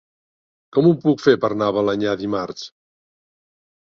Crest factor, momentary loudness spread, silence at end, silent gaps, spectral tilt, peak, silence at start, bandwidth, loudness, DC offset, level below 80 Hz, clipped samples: 18 dB; 13 LU; 1.3 s; none; -7 dB/octave; -2 dBFS; 0.75 s; 7 kHz; -19 LUFS; under 0.1%; -58 dBFS; under 0.1%